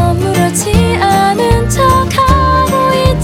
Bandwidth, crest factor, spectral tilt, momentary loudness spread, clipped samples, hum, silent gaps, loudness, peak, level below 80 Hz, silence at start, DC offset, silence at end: 16.5 kHz; 10 dB; -5 dB/octave; 2 LU; 0.2%; none; none; -10 LUFS; 0 dBFS; -20 dBFS; 0 s; under 0.1%; 0 s